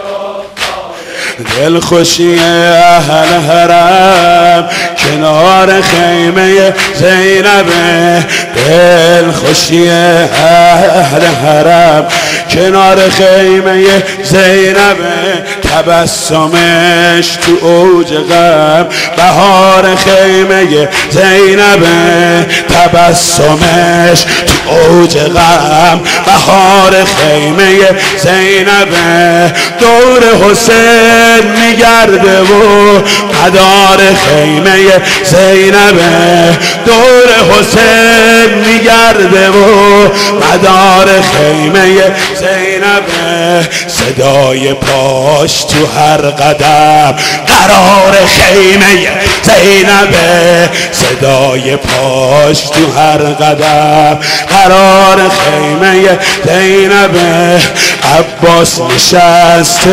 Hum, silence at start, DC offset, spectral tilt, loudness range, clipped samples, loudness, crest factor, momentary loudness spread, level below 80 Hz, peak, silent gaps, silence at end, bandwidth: none; 0 s; 0.5%; -3.5 dB/octave; 3 LU; 4%; -5 LUFS; 4 dB; 5 LU; -32 dBFS; 0 dBFS; none; 0 s; 16.5 kHz